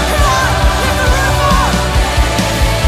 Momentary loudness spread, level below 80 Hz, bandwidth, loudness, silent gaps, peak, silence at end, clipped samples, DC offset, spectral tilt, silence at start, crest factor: 2 LU; -16 dBFS; 15.5 kHz; -12 LUFS; none; 0 dBFS; 0 s; under 0.1%; under 0.1%; -4 dB/octave; 0 s; 12 dB